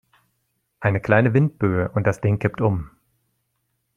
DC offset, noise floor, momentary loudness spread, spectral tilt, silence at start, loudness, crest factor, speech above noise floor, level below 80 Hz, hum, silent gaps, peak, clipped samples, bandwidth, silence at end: under 0.1%; -73 dBFS; 8 LU; -9 dB/octave; 0.8 s; -21 LUFS; 20 dB; 53 dB; -50 dBFS; none; none; -2 dBFS; under 0.1%; 7.4 kHz; 1.1 s